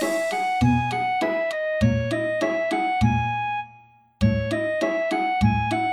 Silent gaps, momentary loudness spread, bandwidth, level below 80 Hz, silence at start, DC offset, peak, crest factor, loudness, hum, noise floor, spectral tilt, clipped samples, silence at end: none; 4 LU; 16 kHz; -40 dBFS; 0 s; under 0.1%; -6 dBFS; 16 dB; -23 LUFS; none; -52 dBFS; -6.5 dB/octave; under 0.1%; 0 s